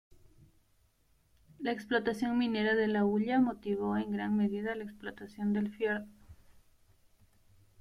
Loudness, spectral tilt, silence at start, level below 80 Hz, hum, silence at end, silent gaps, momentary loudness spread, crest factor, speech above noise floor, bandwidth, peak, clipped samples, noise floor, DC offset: -32 LUFS; -7 dB/octave; 1.6 s; -66 dBFS; none; 1.45 s; none; 11 LU; 18 dB; 38 dB; 11 kHz; -16 dBFS; under 0.1%; -70 dBFS; under 0.1%